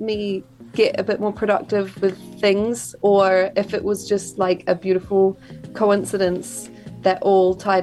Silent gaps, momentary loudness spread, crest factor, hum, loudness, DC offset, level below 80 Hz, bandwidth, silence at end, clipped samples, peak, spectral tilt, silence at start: none; 11 LU; 16 dB; none; -20 LUFS; under 0.1%; -54 dBFS; 12.5 kHz; 0 s; under 0.1%; -4 dBFS; -5 dB/octave; 0 s